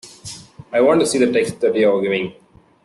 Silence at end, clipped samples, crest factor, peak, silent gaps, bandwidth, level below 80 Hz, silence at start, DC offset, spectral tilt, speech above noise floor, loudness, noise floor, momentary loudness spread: 0.5 s; under 0.1%; 14 dB; -4 dBFS; none; 12.5 kHz; -58 dBFS; 0.05 s; under 0.1%; -4.5 dB/octave; 21 dB; -17 LUFS; -37 dBFS; 19 LU